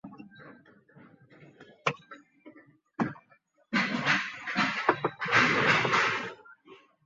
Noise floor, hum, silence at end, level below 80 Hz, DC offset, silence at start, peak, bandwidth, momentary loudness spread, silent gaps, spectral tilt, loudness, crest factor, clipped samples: -65 dBFS; none; 0.3 s; -68 dBFS; under 0.1%; 0.05 s; -6 dBFS; 7.6 kHz; 22 LU; none; -2 dB/octave; -27 LUFS; 24 dB; under 0.1%